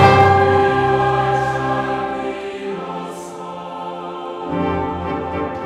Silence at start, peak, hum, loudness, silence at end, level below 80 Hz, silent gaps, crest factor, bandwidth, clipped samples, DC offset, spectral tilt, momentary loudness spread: 0 s; 0 dBFS; none; -19 LUFS; 0 s; -44 dBFS; none; 18 dB; 12 kHz; under 0.1%; under 0.1%; -6.5 dB/octave; 16 LU